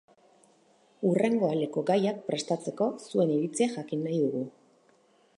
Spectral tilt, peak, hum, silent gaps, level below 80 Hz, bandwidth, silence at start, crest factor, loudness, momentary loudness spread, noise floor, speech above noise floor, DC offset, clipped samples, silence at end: -6 dB/octave; -12 dBFS; none; none; -80 dBFS; 11 kHz; 1 s; 16 dB; -29 LUFS; 7 LU; -64 dBFS; 36 dB; under 0.1%; under 0.1%; 0.9 s